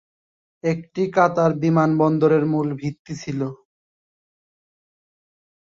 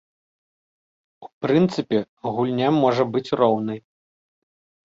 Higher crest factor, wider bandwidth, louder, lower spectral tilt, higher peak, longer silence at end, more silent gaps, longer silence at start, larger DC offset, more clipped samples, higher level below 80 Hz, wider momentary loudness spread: about the same, 20 dB vs 20 dB; about the same, 7.6 kHz vs 7.8 kHz; about the same, -20 LUFS vs -21 LUFS; about the same, -8 dB/octave vs -7.5 dB/octave; about the same, -2 dBFS vs -4 dBFS; first, 2.2 s vs 1.1 s; second, 2.99-3.05 s vs 1.33-1.41 s, 2.09-2.17 s; second, 0.65 s vs 1.2 s; neither; neither; about the same, -62 dBFS vs -64 dBFS; about the same, 12 LU vs 10 LU